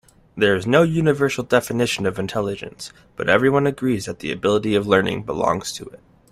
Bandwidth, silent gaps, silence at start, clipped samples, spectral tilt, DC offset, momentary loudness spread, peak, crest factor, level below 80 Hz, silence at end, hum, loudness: 15.5 kHz; none; 0.35 s; under 0.1%; -5.5 dB/octave; under 0.1%; 15 LU; -2 dBFS; 18 dB; -52 dBFS; 0.35 s; none; -20 LUFS